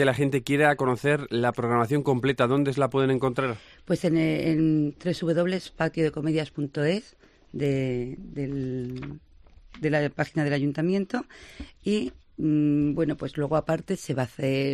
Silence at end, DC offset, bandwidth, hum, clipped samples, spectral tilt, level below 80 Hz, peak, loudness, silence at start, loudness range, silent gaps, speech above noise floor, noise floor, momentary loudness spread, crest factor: 0 s; under 0.1%; 13 kHz; none; under 0.1%; -7 dB/octave; -54 dBFS; -8 dBFS; -26 LUFS; 0 s; 6 LU; none; 26 dB; -51 dBFS; 10 LU; 18 dB